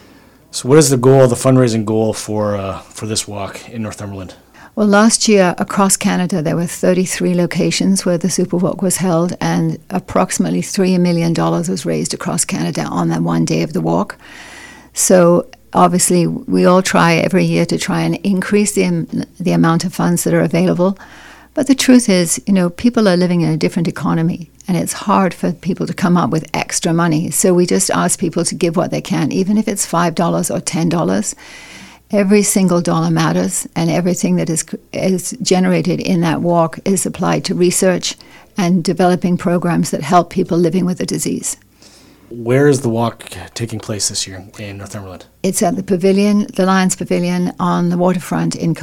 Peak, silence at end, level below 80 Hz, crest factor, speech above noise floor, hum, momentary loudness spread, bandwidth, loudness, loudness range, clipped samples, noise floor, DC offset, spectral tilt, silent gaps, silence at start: 0 dBFS; 0 s; -48 dBFS; 14 dB; 30 dB; none; 13 LU; 16 kHz; -15 LUFS; 4 LU; 0.1%; -45 dBFS; under 0.1%; -5 dB/octave; none; 0.55 s